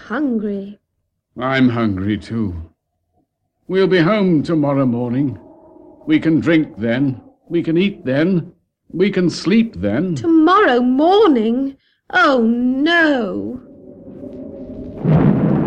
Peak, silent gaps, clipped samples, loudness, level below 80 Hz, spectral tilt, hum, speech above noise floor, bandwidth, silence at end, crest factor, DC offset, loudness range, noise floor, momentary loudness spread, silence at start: -2 dBFS; none; under 0.1%; -16 LUFS; -46 dBFS; -7.5 dB/octave; none; 56 dB; 8.8 kHz; 0 s; 16 dB; under 0.1%; 4 LU; -71 dBFS; 19 LU; 0.05 s